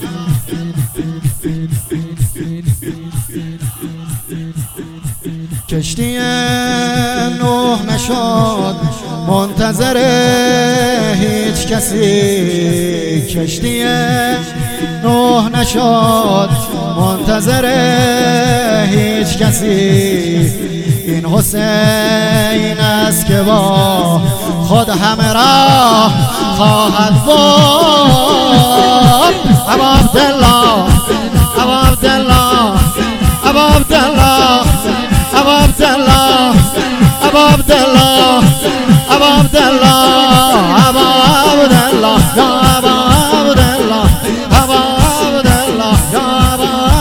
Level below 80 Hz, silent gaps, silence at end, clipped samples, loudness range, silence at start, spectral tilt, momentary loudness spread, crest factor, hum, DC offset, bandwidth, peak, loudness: -22 dBFS; none; 0 s; 1%; 9 LU; 0 s; -4.5 dB/octave; 11 LU; 10 dB; none; under 0.1%; 19.5 kHz; 0 dBFS; -10 LUFS